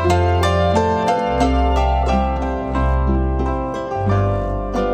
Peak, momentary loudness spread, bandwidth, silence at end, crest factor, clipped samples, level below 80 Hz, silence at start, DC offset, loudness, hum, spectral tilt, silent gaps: -2 dBFS; 6 LU; 9.8 kHz; 0 s; 14 dB; under 0.1%; -22 dBFS; 0 s; under 0.1%; -18 LUFS; none; -7 dB/octave; none